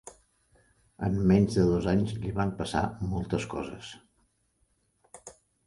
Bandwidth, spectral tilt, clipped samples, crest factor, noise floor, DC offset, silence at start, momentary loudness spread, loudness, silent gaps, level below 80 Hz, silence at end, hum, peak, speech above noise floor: 11.5 kHz; -7 dB/octave; under 0.1%; 20 dB; -72 dBFS; under 0.1%; 0.05 s; 23 LU; -28 LUFS; none; -46 dBFS; 0.35 s; none; -10 dBFS; 45 dB